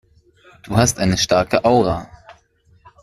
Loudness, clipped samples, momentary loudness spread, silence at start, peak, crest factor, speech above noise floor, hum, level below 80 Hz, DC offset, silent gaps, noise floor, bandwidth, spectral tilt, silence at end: -17 LUFS; under 0.1%; 6 LU; 0.65 s; -2 dBFS; 18 dB; 39 dB; none; -42 dBFS; under 0.1%; none; -55 dBFS; 15 kHz; -4.5 dB/octave; 0.7 s